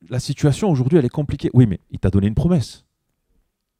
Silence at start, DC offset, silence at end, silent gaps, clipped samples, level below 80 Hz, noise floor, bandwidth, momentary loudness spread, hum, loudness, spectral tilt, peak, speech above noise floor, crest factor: 0.1 s; under 0.1%; 1.05 s; none; under 0.1%; -38 dBFS; -69 dBFS; 12 kHz; 7 LU; none; -19 LUFS; -8 dB/octave; 0 dBFS; 52 dB; 18 dB